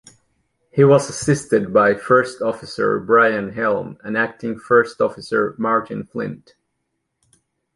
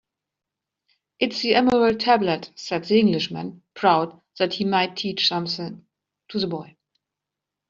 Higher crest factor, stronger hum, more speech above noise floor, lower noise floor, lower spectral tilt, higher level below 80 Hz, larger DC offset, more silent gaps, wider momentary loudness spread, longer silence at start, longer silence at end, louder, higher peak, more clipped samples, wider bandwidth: about the same, 18 dB vs 20 dB; neither; second, 56 dB vs 64 dB; second, -74 dBFS vs -86 dBFS; first, -6 dB/octave vs -3 dB/octave; first, -56 dBFS vs -62 dBFS; neither; neither; about the same, 11 LU vs 13 LU; second, 0.75 s vs 1.2 s; first, 1.4 s vs 1.05 s; first, -18 LUFS vs -22 LUFS; about the same, -2 dBFS vs -2 dBFS; neither; first, 11.5 kHz vs 7.6 kHz